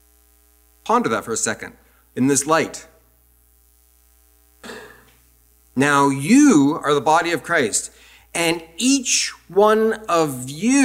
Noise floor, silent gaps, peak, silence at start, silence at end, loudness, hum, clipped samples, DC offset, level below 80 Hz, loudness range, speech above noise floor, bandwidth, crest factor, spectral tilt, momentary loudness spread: -56 dBFS; none; -2 dBFS; 0.85 s; 0 s; -18 LUFS; none; under 0.1%; under 0.1%; -56 dBFS; 7 LU; 38 dB; 16 kHz; 18 dB; -3.5 dB/octave; 20 LU